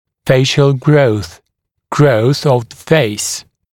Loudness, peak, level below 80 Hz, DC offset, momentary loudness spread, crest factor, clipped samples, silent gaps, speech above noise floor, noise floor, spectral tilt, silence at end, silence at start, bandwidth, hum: -13 LUFS; 0 dBFS; -46 dBFS; under 0.1%; 10 LU; 14 dB; under 0.1%; none; 60 dB; -71 dBFS; -5.5 dB/octave; 0.3 s; 0.25 s; 16.5 kHz; none